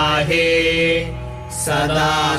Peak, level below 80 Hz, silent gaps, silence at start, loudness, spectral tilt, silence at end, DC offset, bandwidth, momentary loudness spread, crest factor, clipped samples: -6 dBFS; -36 dBFS; none; 0 s; -17 LUFS; -4 dB/octave; 0 s; under 0.1%; 16 kHz; 13 LU; 12 dB; under 0.1%